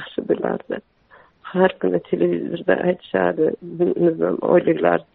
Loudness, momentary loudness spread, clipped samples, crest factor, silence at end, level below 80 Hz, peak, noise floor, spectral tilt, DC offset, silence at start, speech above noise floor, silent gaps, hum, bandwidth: -20 LUFS; 7 LU; under 0.1%; 18 dB; 0.15 s; -60 dBFS; -2 dBFS; -52 dBFS; -6 dB/octave; under 0.1%; 0 s; 33 dB; none; none; 4.1 kHz